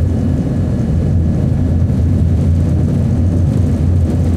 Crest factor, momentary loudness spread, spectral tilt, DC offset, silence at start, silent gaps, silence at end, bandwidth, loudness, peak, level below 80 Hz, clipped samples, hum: 10 dB; 2 LU; -9.5 dB/octave; under 0.1%; 0 s; none; 0 s; 8.8 kHz; -14 LUFS; -2 dBFS; -22 dBFS; under 0.1%; none